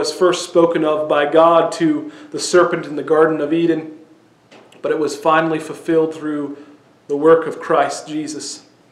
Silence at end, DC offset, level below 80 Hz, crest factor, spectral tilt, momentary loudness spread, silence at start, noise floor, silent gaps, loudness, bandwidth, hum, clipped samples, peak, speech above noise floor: 0.3 s; under 0.1%; -62 dBFS; 16 dB; -4.5 dB/octave; 13 LU; 0 s; -49 dBFS; none; -17 LUFS; 12.5 kHz; none; under 0.1%; 0 dBFS; 33 dB